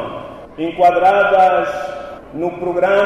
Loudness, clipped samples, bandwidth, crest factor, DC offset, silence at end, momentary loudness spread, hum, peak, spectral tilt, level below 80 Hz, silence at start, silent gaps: -15 LUFS; under 0.1%; 11 kHz; 12 dB; under 0.1%; 0 s; 19 LU; none; -2 dBFS; -6 dB/octave; -50 dBFS; 0 s; none